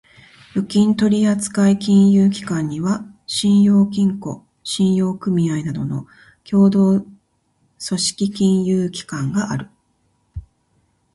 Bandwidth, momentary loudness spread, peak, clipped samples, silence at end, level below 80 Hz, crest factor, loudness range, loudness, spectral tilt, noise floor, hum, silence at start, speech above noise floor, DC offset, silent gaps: 11.5 kHz; 14 LU; -4 dBFS; under 0.1%; 0.75 s; -50 dBFS; 14 dB; 6 LU; -18 LUFS; -6 dB/octave; -64 dBFS; none; 0.55 s; 47 dB; under 0.1%; none